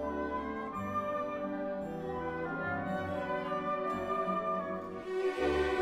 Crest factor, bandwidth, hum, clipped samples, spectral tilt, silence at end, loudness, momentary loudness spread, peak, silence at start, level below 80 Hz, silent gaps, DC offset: 16 dB; 13 kHz; none; under 0.1%; -6.5 dB/octave; 0 s; -35 LUFS; 6 LU; -20 dBFS; 0 s; -56 dBFS; none; under 0.1%